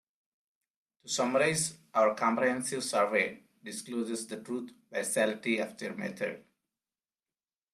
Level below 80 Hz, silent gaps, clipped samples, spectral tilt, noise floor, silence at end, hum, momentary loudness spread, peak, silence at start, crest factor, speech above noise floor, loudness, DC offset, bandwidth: -76 dBFS; none; under 0.1%; -3 dB/octave; under -90 dBFS; 1.35 s; none; 12 LU; -14 dBFS; 1.05 s; 20 dB; over 59 dB; -31 LUFS; under 0.1%; 13 kHz